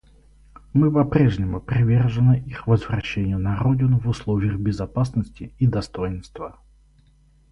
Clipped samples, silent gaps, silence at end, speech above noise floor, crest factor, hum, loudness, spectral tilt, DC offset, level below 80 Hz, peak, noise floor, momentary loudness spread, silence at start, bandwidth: under 0.1%; none; 1 s; 35 dB; 18 dB; none; -21 LUFS; -8.5 dB/octave; under 0.1%; -40 dBFS; -2 dBFS; -56 dBFS; 11 LU; 0.75 s; 8.2 kHz